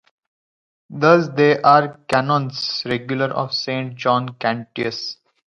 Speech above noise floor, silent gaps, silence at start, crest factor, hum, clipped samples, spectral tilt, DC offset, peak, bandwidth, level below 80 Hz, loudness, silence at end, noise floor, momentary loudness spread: over 72 dB; none; 0.9 s; 20 dB; none; under 0.1%; -6 dB/octave; under 0.1%; 0 dBFS; 11 kHz; -62 dBFS; -19 LUFS; 0.35 s; under -90 dBFS; 10 LU